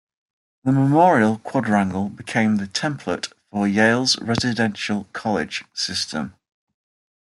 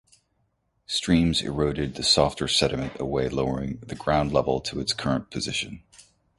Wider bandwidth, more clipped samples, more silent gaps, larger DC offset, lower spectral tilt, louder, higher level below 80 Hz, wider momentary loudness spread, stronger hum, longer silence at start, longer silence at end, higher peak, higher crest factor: about the same, 12 kHz vs 11.5 kHz; neither; neither; neither; about the same, -5 dB/octave vs -4.5 dB/octave; first, -21 LUFS vs -25 LUFS; second, -60 dBFS vs -44 dBFS; first, 12 LU vs 9 LU; neither; second, 0.65 s vs 0.9 s; first, 1.1 s vs 0.4 s; about the same, -4 dBFS vs -4 dBFS; about the same, 18 dB vs 22 dB